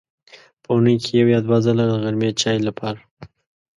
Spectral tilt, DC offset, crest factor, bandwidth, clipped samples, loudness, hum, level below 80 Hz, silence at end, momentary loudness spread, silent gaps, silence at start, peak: -6 dB/octave; under 0.1%; 16 dB; 11 kHz; under 0.1%; -19 LUFS; none; -56 dBFS; 0.5 s; 10 LU; 3.11-3.17 s; 0.7 s; -4 dBFS